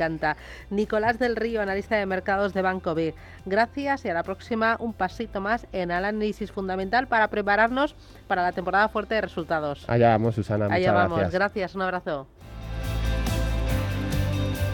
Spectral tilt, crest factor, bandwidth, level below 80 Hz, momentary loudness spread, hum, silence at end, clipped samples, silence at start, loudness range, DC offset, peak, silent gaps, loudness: -6.5 dB/octave; 18 dB; 18 kHz; -38 dBFS; 9 LU; none; 0 s; under 0.1%; 0 s; 3 LU; under 0.1%; -8 dBFS; none; -25 LUFS